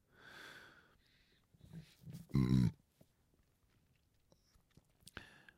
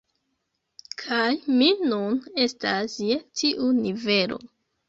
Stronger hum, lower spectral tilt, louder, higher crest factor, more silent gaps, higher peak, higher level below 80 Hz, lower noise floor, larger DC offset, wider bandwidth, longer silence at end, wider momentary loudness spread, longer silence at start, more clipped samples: neither; first, -7.5 dB/octave vs -4 dB/octave; second, -36 LUFS vs -24 LUFS; first, 22 dB vs 16 dB; neither; second, -22 dBFS vs -8 dBFS; first, -60 dBFS vs -66 dBFS; about the same, -76 dBFS vs -77 dBFS; neither; first, 14.5 kHz vs 7.8 kHz; first, 2.85 s vs 0.45 s; first, 24 LU vs 8 LU; second, 0.35 s vs 1 s; neither